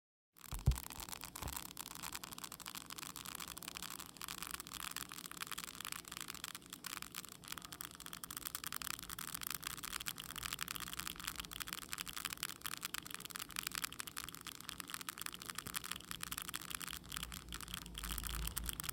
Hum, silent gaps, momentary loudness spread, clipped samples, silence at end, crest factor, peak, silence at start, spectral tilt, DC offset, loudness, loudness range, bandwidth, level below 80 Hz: 60 Hz at -75 dBFS; none; 6 LU; under 0.1%; 0 s; 32 dB; -16 dBFS; 0.4 s; -1.5 dB/octave; under 0.1%; -45 LUFS; 3 LU; 17 kHz; -54 dBFS